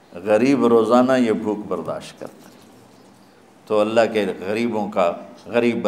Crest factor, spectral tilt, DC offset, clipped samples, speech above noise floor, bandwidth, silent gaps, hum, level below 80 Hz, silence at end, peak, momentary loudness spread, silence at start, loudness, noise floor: 20 dB; -6 dB/octave; under 0.1%; under 0.1%; 31 dB; 13.5 kHz; none; none; -66 dBFS; 0 s; -2 dBFS; 16 LU; 0.15 s; -19 LUFS; -50 dBFS